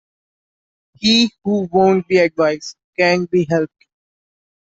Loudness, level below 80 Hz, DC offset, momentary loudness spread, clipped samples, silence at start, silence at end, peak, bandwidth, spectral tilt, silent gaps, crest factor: -16 LUFS; -58 dBFS; under 0.1%; 8 LU; under 0.1%; 1 s; 1.1 s; -2 dBFS; 8 kHz; -5 dB/octave; 2.84-2.93 s; 16 dB